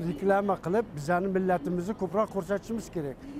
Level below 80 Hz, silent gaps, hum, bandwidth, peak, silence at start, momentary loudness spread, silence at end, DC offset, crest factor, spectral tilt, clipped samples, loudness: -54 dBFS; none; none; 15.5 kHz; -14 dBFS; 0 s; 7 LU; 0 s; under 0.1%; 16 dB; -7.5 dB/octave; under 0.1%; -29 LUFS